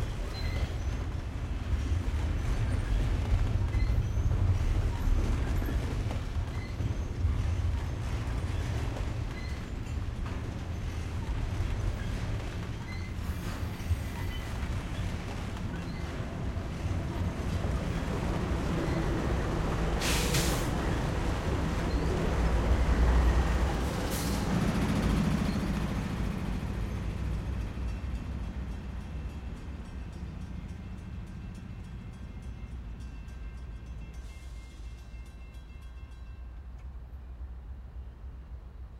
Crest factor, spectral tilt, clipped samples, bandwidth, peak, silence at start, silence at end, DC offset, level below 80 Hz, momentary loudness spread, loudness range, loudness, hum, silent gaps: 18 dB; -6 dB/octave; under 0.1%; 16.5 kHz; -14 dBFS; 0 s; 0 s; under 0.1%; -34 dBFS; 16 LU; 15 LU; -33 LUFS; none; none